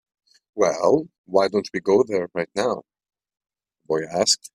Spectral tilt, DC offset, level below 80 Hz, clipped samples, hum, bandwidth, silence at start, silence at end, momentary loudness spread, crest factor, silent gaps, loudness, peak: -3.5 dB/octave; under 0.1%; -64 dBFS; under 0.1%; none; 14 kHz; 0.55 s; 0.05 s; 7 LU; 20 dB; 1.18-1.24 s; -22 LUFS; -2 dBFS